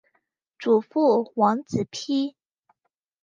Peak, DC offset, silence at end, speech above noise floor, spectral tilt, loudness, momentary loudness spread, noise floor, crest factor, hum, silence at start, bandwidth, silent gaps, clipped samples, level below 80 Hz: -6 dBFS; under 0.1%; 0.95 s; 55 dB; -6 dB/octave; -24 LUFS; 8 LU; -77 dBFS; 18 dB; none; 0.6 s; 9.2 kHz; none; under 0.1%; -66 dBFS